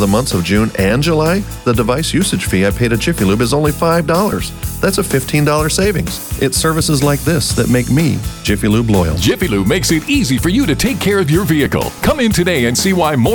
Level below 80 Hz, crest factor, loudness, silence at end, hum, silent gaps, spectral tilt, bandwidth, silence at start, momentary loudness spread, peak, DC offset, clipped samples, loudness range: -28 dBFS; 12 dB; -14 LUFS; 0 s; none; none; -5 dB/octave; over 20 kHz; 0 s; 3 LU; -2 dBFS; under 0.1%; under 0.1%; 1 LU